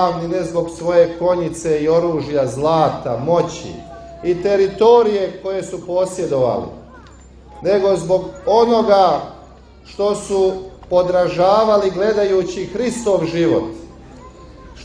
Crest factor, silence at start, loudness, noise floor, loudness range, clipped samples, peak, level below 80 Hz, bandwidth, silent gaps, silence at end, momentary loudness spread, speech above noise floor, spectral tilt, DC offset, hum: 16 dB; 0 s; -17 LUFS; -41 dBFS; 2 LU; under 0.1%; 0 dBFS; -44 dBFS; 10.5 kHz; none; 0 s; 12 LU; 25 dB; -6 dB/octave; under 0.1%; none